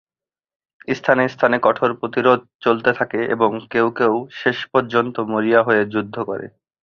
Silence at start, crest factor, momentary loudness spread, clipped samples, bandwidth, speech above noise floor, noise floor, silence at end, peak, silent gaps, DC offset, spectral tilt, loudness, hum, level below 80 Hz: 0.9 s; 18 dB; 10 LU; under 0.1%; 6.8 kHz; over 72 dB; under -90 dBFS; 0.35 s; -2 dBFS; 2.55-2.59 s; under 0.1%; -7 dB/octave; -19 LUFS; none; -62 dBFS